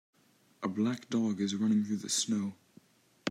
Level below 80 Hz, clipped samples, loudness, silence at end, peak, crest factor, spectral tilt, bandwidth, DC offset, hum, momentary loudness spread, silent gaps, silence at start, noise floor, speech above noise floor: -82 dBFS; under 0.1%; -32 LUFS; 0 s; -16 dBFS; 16 dB; -4 dB/octave; 15.5 kHz; under 0.1%; none; 10 LU; none; 0.6 s; -62 dBFS; 31 dB